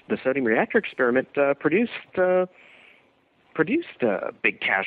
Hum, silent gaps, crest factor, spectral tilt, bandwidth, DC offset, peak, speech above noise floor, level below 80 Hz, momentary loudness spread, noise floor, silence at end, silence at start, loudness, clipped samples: none; none; 18 dB; -8.5 dB/octave; 4.7 kHz; under 0.1%; -6 dBFS; 39 dB; -68 dBFS; 5 LU; -62 dBFS; 0 s; 0.1 s; -23 LUFS; under 0.1%